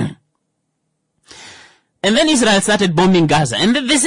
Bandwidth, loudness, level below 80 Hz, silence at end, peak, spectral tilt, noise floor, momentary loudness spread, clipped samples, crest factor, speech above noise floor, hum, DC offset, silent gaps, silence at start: 11 kHz; -13 LUFS; -46 dBFS; 0 s; -4 dBFS; -4 dB/octave; -71 dBFS; 4 LU; under 0.1%; 12 dB; 57 dB; none; under 0.1%; none; 0 s